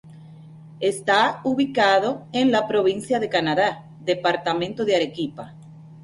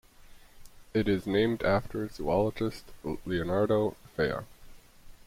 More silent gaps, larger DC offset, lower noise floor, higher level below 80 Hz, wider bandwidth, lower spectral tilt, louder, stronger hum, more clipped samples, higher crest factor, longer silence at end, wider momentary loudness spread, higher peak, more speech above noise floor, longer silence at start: neither; neither; second, -43 dBFS vs -52 dBFS; second, -62 dBFS vs -50 dBFS; second, 11.5 kHz vs 16.5 kHz; second, -4.5 dB/octave vs -7 dB/octave; first, -22 LUFS vs -30 LUFS; neither; neither; about the same, 16 dB vs 18 dB; about the same, 0 s vs 0.1 s; about the same, 9 LU vs 11 LU; first, -6 dBFS vs -14 dBFS; about the same, 22 dB vs 23 dB; second, 0.05 s vs 0.3 s